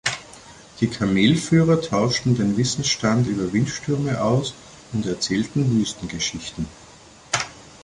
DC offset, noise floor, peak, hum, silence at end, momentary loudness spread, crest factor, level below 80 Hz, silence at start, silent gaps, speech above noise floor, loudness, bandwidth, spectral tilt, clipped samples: under 0.1%; -44 dBFS; -4 dBFS; none; 0.2 s; 13 LU; 18 dB; -48 dBFS; 0.05 s; none; 23 dB; -22 LUFS; 11.5 kHz; -5 dB/octave; under 0.1%